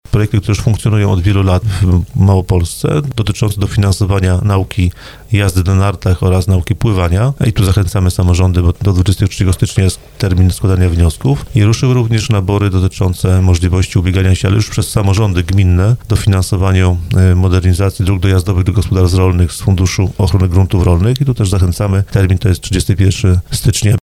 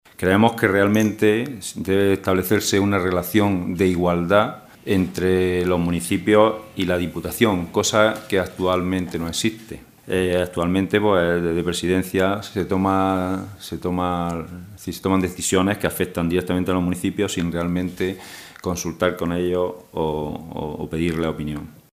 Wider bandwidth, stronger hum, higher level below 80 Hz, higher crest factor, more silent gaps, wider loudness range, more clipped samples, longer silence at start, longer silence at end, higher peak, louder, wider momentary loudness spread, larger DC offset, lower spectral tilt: second, 13.5 kHz vs 16 kHz; neither; first, -24 dBFS vs -46 dBFS; second, 10 dB vs 20 dB; neither; second, 1 LU vs 5 LU; neither; about the same, 0.1 s vs 0.2 s; second, 0.05 s vs 0.2 s; about the same, 0 dBFS vs 0 dBFS; first, -12 LUFS vs -21 LUFS; second, 3 LU vs 11 LU; neither; about the same, -6.5 dB/octave vs -5.5 dB/octave